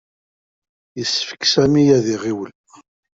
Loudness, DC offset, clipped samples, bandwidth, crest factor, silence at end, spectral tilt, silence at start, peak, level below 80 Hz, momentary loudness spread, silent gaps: -17 LUFS; under 0.1%; under 0.1%; 7.8 kHz; 16 dB; 0.7 s; -4.5 dB/octave; 0.95 s; -2 dBFS; -52 dBFS; 16 LU; none